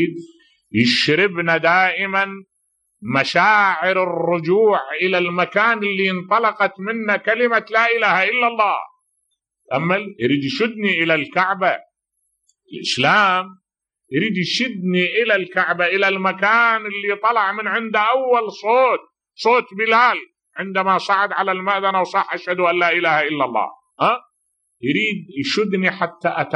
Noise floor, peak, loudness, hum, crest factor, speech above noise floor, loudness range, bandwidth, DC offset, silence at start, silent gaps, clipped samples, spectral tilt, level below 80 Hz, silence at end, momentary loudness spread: -73 dBFS; -2 dBFS; -18 LUFS; none; 16 dB; 55 dB; 3 LU; 10.5 kHz; under 0.1%; 0 s; none; under 0.1%; -5 dB/octave; -70 dBFS; 0 s; 9 LU